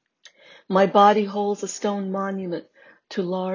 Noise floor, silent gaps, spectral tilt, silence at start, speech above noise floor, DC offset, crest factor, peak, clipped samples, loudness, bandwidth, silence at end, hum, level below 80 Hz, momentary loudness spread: -53 dBFS; none; -5.5 dB/octave; 0.7 s; 32 dB; under 0.1%; 18 dB; -4 dBFS; under 0.1%; -22 LUFS; 7.4 kHz; 0 s; none; -72 dBFS; 15 LU